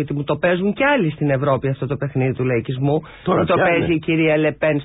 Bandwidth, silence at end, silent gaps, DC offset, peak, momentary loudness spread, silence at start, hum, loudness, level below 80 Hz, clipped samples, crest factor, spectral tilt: 4 kHz; 0 s; none; under 0.1%; -6 dBFS; 6 LU; 0 s; none; -19 LUFS; -46 dBFS; under 0.1%; 12 dB; -12 dB/octave